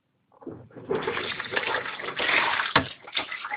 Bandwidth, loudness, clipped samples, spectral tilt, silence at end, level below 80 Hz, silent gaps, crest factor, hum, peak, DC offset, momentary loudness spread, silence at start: 5.4 kHz; -26 LUFS; under 0.1%; -7.5 dB/octave; 0 s; -60 dBFS; none; 26 dB; none; -4 dBFS; under 0.1%; 21 LU; 0.4 s